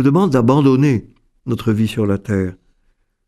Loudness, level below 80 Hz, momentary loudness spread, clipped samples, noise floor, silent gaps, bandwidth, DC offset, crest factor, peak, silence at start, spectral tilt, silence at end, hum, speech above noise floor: -16 LUFS; -46 dBFS; 11 LU; under 0.1%; -61 dBFS; none; 13.5 kHz; under 0.1%; 16 dB; 0 dBFS; 0 s; -8 dB/octave; 0.75 s; none; 46 dB